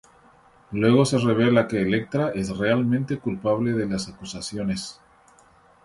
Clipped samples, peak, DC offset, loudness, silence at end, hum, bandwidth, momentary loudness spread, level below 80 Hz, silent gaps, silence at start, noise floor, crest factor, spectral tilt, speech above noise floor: under 0.1%; -6 dBFS; under 0.1%; -23 LUFS; 0.95 s; none; 11.5 kHz; 13 LU; -52 dBFS; none; 0.7 s; -55 dBFS; 18 dB; -6 dB/octave; 33 dB